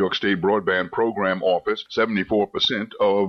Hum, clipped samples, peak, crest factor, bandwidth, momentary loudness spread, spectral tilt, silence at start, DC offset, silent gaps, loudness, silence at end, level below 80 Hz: none; under 0.1%; -10 dBFS; 12 dB; 6.8 kHz; 3 LU; -5.5 dB/octave; 0 s; under 0.1%; none; -22 LUFS; 0 s; -58 dBFS